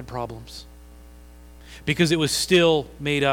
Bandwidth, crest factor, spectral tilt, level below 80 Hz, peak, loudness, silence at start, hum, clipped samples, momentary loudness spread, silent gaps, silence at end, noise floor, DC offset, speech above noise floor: 17 kHz; 18 dB; -4.5 dB/octave; -46 dBFS; -6 dBFS; -21 LUFS; 0 s; 60 Hz at -45 dBFS; under 0.1%; 21 LU; none; 0 s; -45 dBFS; under 0.1%; 23 dB